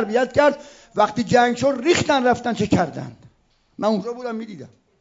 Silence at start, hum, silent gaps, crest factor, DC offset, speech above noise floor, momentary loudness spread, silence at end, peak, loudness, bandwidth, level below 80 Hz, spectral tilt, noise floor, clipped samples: 0 s; none; none; 16 dB; under 0.1%; 40 dB; 17 LU; 0.35 s; -4 dBFS; -20 LUFS; 7.8 kHz; -54 dBFS; -5 dB/octave; -60 dBFS; under 0.1%